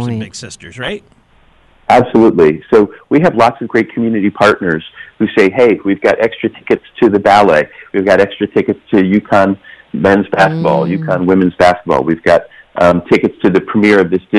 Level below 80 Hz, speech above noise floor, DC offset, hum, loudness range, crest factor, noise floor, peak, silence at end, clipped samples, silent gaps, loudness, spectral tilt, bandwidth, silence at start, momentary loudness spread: -44 dBFS; 36 dB; under 0.1%; none; 2 LU; 10 dB; -48 dBFS; 0 dBFS; 0 s; under 0.1%; none; -11 LUFS; -6.5 dB/octave; 11.5 kHz; 0 s; 12 LU